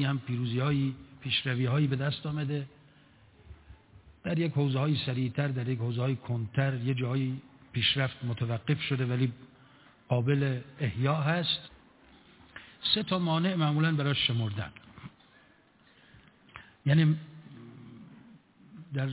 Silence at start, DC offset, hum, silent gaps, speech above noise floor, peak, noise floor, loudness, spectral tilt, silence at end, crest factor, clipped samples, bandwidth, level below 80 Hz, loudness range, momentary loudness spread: 0 s; under 0.1%; none; none; 33 dB; -12 dBFS; -62 dBFS; -30 LUFS; -5 dB/octave; 0 s; 20 dB; under 0.1%; 4 kHz; -60 dBFS; 4 LU; 23 LU